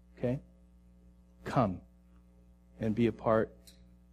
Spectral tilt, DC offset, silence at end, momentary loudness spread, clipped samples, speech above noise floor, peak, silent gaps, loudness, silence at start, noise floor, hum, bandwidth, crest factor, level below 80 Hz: -8.5 dB/octave; under 0.1%; 0.4 s; 10 LU; under 0.1%; 30 dB; -14 dBFS; none; -33 LUFS; 0.2 s; -60 dBFS; 60 Hz at -55 dBFS; 13.5 kHz; 20 dB; -58 dBFS